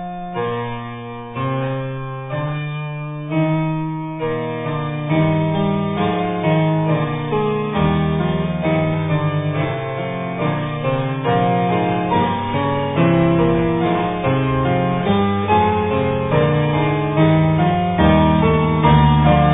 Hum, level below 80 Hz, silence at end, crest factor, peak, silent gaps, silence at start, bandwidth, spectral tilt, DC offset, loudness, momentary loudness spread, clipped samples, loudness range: none; -36 dBFS; 0 s; 16 dB; -2 dBFS; none; 0 s; 3.9 kHz; -11.5 dB/octave; under 0.1%; -18 LUFS; 10 LU; under 0.1%; 7 LU